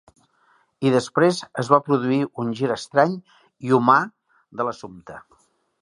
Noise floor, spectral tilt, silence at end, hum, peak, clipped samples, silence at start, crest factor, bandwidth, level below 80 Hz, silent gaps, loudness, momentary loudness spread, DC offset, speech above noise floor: -62 dBFS; -6 dB/octave; 0.65 s; none; 0 dBFS; under 0.1%; 0.8 s; 22 dB; 11.5 kHz; -66 dBFS; none; -21 LUFS; 19 LU; under 0.1%; 41 dB